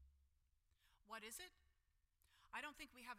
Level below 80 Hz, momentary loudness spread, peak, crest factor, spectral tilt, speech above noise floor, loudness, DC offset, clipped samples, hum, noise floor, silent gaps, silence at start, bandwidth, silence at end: -78 dBFS; 6 LU; -38 dBFS; 22 dB; -1 dB/octave; 27 dB; -55 LUFS; under 0.1%; under 0.1%; none; -83 dBFS; none; 0 s; 16 kHz; 0 s